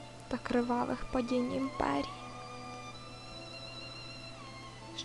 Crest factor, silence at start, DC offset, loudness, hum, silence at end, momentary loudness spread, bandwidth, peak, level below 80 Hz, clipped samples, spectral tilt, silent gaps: 22 dB; 0 s; under 0.1%; -37 LUFS; none; 0 s; 14 LU; 11.5 kHz; -16 dBFS; -54 dBFS; under 0.1%; -5 dB/octave; none